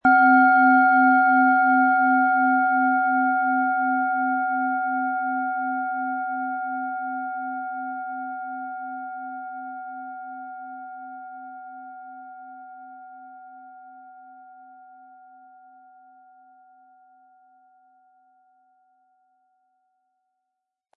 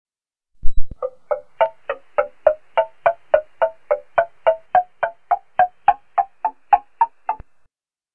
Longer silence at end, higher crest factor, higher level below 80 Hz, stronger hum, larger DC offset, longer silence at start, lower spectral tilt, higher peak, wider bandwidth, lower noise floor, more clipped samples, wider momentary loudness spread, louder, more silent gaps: first, 6.55 s vs 0.8 s; about the same, 18 dB vs 18 dB; second, -74 dBFS vs -34 dBFS; neither; second, under 0.1% vs 0.4%; second, 0.05 s vs 0.65 s; first, -8 dB/octave vs -6.5 dB/octave; second, -6 dBFS vs 0 dBFS; first, 4.5 kHz vs 3.4 kHz; first, -83 dBFS vs -65 dBFS; neither; first, 25 LU vs 13 LU; about the same, -21 LUFS vs -21 LUFS; neither